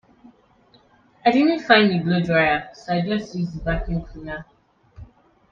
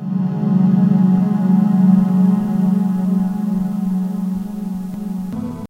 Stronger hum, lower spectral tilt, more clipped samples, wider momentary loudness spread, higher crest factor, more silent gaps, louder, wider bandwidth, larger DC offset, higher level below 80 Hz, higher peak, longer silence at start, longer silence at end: neither; second, -7 dB/octave vs -10 dB/octave; neither; first, 16 LU vs 12 LU; first, 22 dB vs 14 dB; neither; second, -20 LUFS vs -17 LUFS; first, 7.2 kHz vs 3.5 kHz; neither; first, -40 dBFS vs -48 dBFS; about the same, 0 dBFS vs -2 dBFS; first, 1.25 s vs 0 s; first, 0.5 s vs 0.05 s